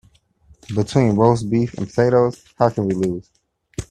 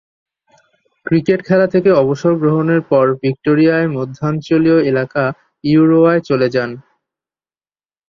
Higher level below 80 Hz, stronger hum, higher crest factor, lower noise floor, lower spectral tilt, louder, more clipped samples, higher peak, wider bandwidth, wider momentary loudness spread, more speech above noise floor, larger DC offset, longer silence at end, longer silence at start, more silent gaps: first, -48 dBFS vs -54 dBFS; neither; first, 20 dB vs 14 dB; second, -53 dBFS vs under -90 dBFS; about the same, -7.5 dB/octave vs -8.5 dB/octave; second, -19 LUFS vs -14 LUFS; neither; about the same, 0 dBFS vs -2 dBFS; first, 11 kHz vs 7 kHz; first, 12 LU vs 8 LU; second, 35 dB vs over 77 dB; neither; second, 0.05 s vs 1.3 s; second, 0.7 s vs 1.05 s; neither